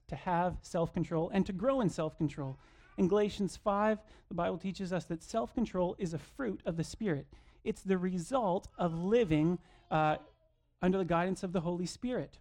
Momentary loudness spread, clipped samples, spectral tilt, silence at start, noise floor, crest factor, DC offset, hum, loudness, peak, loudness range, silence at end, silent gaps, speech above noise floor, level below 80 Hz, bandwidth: 9 LU; under 0.1%; -7 dB/octave; 0.1 s; -71 dBFS; 16 dB; under 0.1%; none; -34 LUFS; -18 dBFS; 4 LU; 0.05 s; none; 38 dB; -56 dBFS; 11.5 kHz